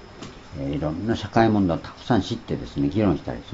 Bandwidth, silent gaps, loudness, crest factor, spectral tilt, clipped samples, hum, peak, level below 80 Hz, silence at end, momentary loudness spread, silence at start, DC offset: 7.8 kHz; none; -24 LUFS; 20 dB; -7.5 dB/octave; under 0.1%; none; -4 dBFS; -44 dBFS; 0 s; 13 LU; 0 s; under 0.1%